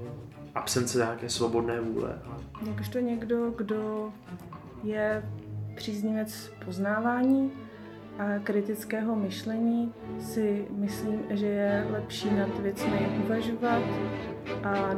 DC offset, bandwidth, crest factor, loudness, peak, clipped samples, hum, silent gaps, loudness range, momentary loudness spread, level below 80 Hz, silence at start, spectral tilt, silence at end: under 0.1%; 15.5 kHz; 18 dB; -30 LUFS; -12 dBFS; under 0.1%; none; none; 4 LU; 12 LU; -58 dBFS; 0 s; -5.5 dB/octave; 0 s